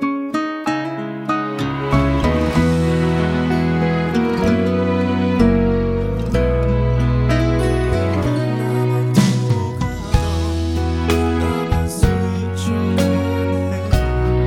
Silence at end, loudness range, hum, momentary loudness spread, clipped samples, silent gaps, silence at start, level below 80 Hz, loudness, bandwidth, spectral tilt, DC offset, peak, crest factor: 0 s; 2 LU; none; 5 LU; under 0.1%; none; 0 s; -26 dBFS; -18 LUFS; 16.5 kHz; -7 dB/octave; under 0.1%; -2 dBFS; 14 dB